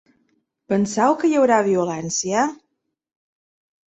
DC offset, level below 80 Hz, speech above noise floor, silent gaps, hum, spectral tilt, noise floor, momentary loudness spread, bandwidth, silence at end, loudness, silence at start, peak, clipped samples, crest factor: under 0.1%; -64 dBFS; 57 dB; none; none; -4.5 dB/octave; -75 dBFS; 7 LU; 8.4 kHz; 1.35 s; -19 LUFS; 0.7 s; -4 dBFS; under 0.1%; 18 dB